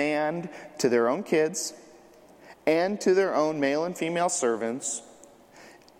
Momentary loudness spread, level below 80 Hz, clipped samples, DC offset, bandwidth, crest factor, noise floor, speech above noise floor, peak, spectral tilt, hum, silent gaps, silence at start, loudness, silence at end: 9 LU; -74 dBFS; under 0.1%; under 0.1%; 16 kHz; 20 dB; -53 dBFS; 27 dB; -8 dBFS; -4 dB/octave; none; none; 0 s; -26 LUFS; 0.3 s